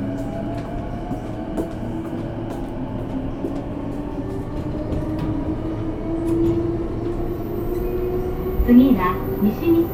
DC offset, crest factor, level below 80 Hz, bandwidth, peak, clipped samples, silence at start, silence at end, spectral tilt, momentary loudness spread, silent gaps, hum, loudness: under 0.1%; 20 dB; -32 dBFS; 15.5 kHz; -2 dBFS; under 0.1%; 0 s; 0 s; -9 dB/octave; 11 LU; none; none; -23 LUFS